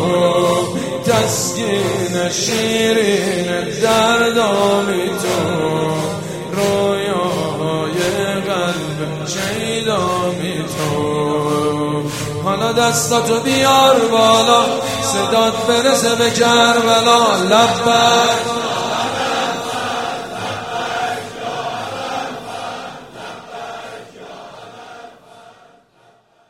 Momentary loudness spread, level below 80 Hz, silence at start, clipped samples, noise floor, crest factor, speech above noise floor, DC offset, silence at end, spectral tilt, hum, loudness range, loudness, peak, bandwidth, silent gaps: 15 LU; -50 dBFS; 0 s; under 0.1%; -52 dBFS; 16 dB; 38 dB; 0.2%; 1 s; -3.5 dB/octave; none; 13 LU; -16 LUFS; 0 dBFS; 16.5 kHz; none